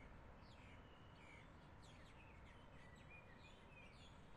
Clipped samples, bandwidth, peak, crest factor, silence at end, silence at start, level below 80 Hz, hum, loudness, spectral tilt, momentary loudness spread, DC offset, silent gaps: under 0.1%; 11 kHz; -50 dBFS; 12 dB; 0 s; 0 s; -68 dBFS; none; -63 LUFS; -5.5 dB/octave; 2 LU; under 0.1%; none